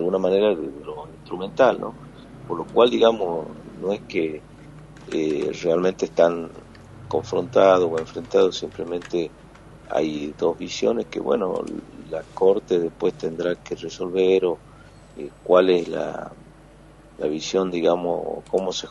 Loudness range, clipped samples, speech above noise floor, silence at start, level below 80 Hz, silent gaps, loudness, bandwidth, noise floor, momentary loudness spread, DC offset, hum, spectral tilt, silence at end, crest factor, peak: 3 LU; under 0.1%; 26 dB; 0 s; -54 dBFS; none; -23 LUFS; 10.5 kHz; -48 dBFS; 16 LU; under 0.1%; none; -5.5 dB/octave; 0 s; 20 dB; -2 dBFS